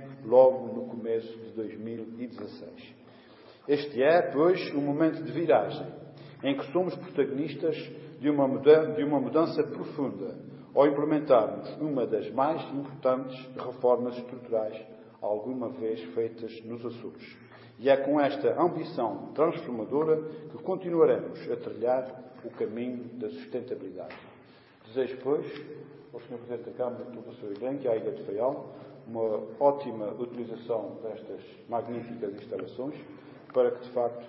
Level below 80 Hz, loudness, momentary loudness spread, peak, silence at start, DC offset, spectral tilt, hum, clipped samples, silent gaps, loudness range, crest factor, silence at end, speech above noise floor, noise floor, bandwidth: -78 dBFS; -29 LUFS; 18 LU; -8 dBFS; 0 s; under 0.1%; -10.5 dB/octave; none; under 0.1%; none; 9 LU; 22 dB; 0 s; 27 dB; -55 dBFS; 5.8 kHz